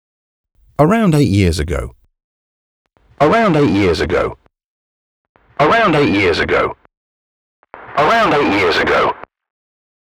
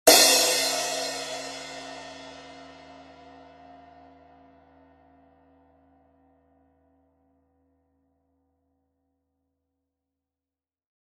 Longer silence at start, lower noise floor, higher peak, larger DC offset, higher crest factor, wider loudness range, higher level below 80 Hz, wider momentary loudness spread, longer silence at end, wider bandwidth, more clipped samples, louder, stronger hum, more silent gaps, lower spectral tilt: first, 0.8 s vs 0.05 s; about the same, under -90 dBFS vs under -90 dBFS; about the same, 0 dBFS vs -2 dBFS; neither; second, 16 dB vs 30 dB; second, 2 LU vs 29 LU; first, -36 dBFS vs -66 dBFS; second, 11 LU vs 30 LU; second, 0.75 s vs 8.55 s; first, 16 kHz vs 14 kHz; neither; first, -14 LUFS vs -21 LUFS; neither; first, 2.24-2.85 s, 4.64-5.35 s, 6.97-7.63 s vs none; first, -6 dB/octave vs 0.5 dB/octave